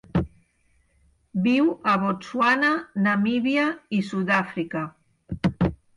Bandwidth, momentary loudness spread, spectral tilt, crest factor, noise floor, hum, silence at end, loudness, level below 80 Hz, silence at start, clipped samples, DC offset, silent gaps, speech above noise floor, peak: 11 kHz; 10 LU; -7 dB/octave; 16 dB; -65 dBFS; none; 0.2 s; -23 LUFS; -46 dBFS; 0.15 s; under 0.1%; under 0.1%; none; 42 dB; -8 dBFS